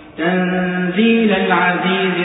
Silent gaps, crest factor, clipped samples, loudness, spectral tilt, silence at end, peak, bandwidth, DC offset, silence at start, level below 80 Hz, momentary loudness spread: none; 14 dB; under 0.1%; -15 LUFS; -11.5 dB/octave; 0 s; -2 dBFS; 4 kHz; under 0.1%; 0 s; -54 dBFS; 5 LU